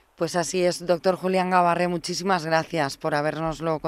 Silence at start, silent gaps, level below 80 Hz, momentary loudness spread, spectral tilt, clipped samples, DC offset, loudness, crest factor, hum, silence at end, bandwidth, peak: 0.2 s; none; -56 dBFS; 6 LU; -4.5 dB/octave; under 0.1%; under 0.1%; -24 LUFS; 18 dB; none; 0 s; 15.5 kHz; -6 dBFS